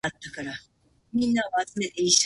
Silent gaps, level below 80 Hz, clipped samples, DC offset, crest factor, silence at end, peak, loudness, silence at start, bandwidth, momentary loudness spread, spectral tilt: none; -60 dBFS; under 0.1%; under 0.1%; 20 dB; 0 s; -6 dBFS; -27 LUFS; 0.05 s; 11.5 kHz; 13 LU; -2 dB/octave